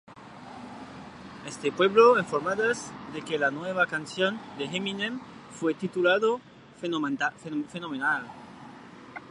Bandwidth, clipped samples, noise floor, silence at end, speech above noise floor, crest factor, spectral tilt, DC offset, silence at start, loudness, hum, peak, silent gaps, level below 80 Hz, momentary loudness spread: 11 kHz; under 0.1%; -47 dBFS; 0 s; 20 dB; 22 dB; -4.5 dB/octave; under 0.1%; 0.1 s; -27 LUFS; none; -6 dBFS; none; -68 dBFS; 21 LU